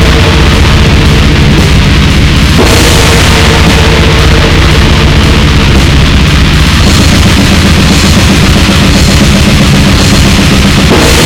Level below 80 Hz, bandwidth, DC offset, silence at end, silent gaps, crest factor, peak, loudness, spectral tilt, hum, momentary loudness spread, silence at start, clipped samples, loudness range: -8 dBFS; 17.5 kHz; under 0.1%; 0 s; none; 4 dB; 0 dBFS; -4 LUFS; -4.5 dB/octave; none; 1 LU; 0 s; 10%; 0 LU